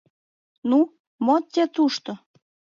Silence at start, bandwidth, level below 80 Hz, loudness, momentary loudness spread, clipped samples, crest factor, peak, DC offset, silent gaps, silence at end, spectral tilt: 0.65 s; 7.4 kHz; -78 dBFS; -23 LUFS; 12 LU; under 0.1%; 16 dB; -8 dBFS; under 0.1%; 1.00-1.19 s; 0.65 s; -5 dB/octave